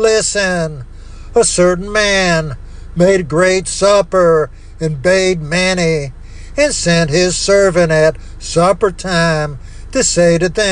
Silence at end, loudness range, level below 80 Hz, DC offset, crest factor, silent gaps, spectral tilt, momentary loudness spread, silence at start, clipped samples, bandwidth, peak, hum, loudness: 0 s; 1 LU; -30 dBFS; under 0.1%; 12 dB; none; -4 dB/octave; 12 LU; 0 s; under 0.1%; 10.5 kHz; 0 dBFS; none; -13 LUFS